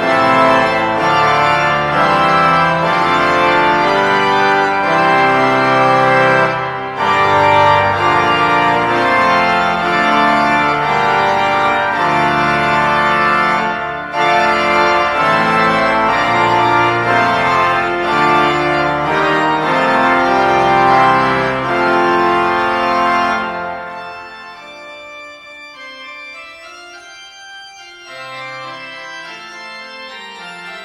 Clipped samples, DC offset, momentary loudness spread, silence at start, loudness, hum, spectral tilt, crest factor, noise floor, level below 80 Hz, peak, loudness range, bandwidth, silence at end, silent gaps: under 0.1%; under 0.1%; 19 LU; 0 s; -12 LUFS; none; -5 dB/octave; 14 dB; -35 dBFS; -44 dBFS; 0 dBFS; 18 LU; 14 kHz; 0 s; none